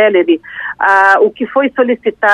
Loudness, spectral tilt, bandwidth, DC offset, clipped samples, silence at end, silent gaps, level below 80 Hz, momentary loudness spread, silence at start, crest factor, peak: -11 LUFS; -5 dB/octave; 9.6 kHz; under 0.1%; under 0.1%; 0 s; none; -58 dBFS; 7 LU; 0 s; 12 dB; 0 dBFS